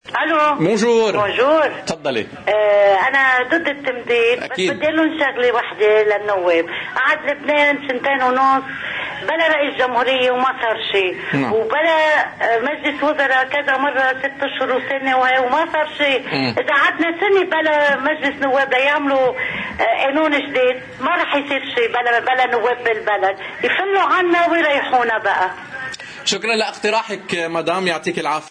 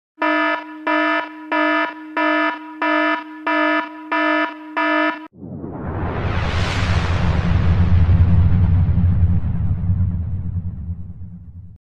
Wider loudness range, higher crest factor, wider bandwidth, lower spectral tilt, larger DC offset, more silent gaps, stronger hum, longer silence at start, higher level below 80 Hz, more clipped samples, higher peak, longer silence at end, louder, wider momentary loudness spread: about the same, 2 LU vs 4 LU; about the same, 12 dB vs 14 dB; first, 10 kHz vs 7.6 kHz; second, -4 dB/octave vs -7.5 dB/octave; neither; neither; neither; second, 0.05 s vs 0.2 s; second, -58 dBFS vs -26 dBFS; neither; about the same, -6 dBFS vs -4 dBFS; about the same, 0 s vs 0.05 s; about the same, -17 LUFS vs -19 LUFS; second, 7 LU vs 13 LU